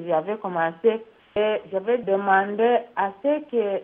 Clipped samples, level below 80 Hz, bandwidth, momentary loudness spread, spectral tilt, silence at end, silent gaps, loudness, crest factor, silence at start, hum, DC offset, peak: under 0.1%; -68 dBFS; 3.8 kHz; 7 LU; -9 dB/octave; 0 s; none; -23 LUFS; 18 dB; 0 s; none; under 0.1%; -6 dBFS